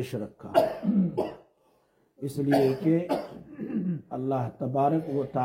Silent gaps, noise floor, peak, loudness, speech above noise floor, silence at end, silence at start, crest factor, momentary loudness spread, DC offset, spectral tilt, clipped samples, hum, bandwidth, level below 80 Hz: none; -67 dBFS; -8 dBFS; -28 LUFS; 40 dB; 0 s; 0 s; 20 dB; 12 LU; under 0.1%; -8 dB/octave; under 0.1%; none; 16.5 kHz; -66 dBFS